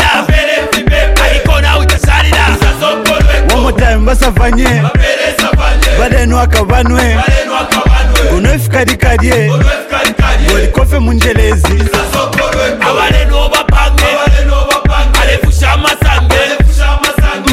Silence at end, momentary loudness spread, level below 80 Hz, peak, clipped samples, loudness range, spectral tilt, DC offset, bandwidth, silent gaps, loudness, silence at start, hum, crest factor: 0 s; 2 LU; -10 dBFS; 0 dBFS; under 0.1%; 1 LU; -4.5 dB/octave; under 0.1%; 16 kHz; none; -9 LUFS; 0 s; none; 8 dB